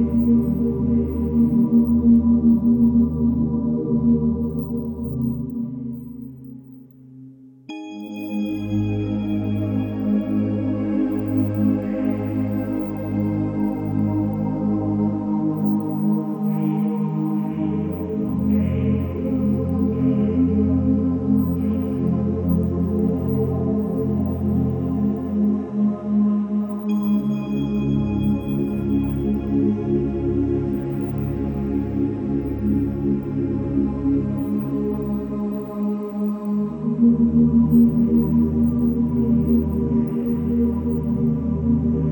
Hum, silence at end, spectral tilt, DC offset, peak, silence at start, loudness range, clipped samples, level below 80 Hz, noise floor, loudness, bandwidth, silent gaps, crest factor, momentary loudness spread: none; 0 s; -11 dB/octave; under 0.1%; -6 dBFS; 0 s; 6 LU; under 0.1%; -38 dBFS; -43 dBFS; -21 LUFS; 19.5 kHz; none; 14 dB; 8 LU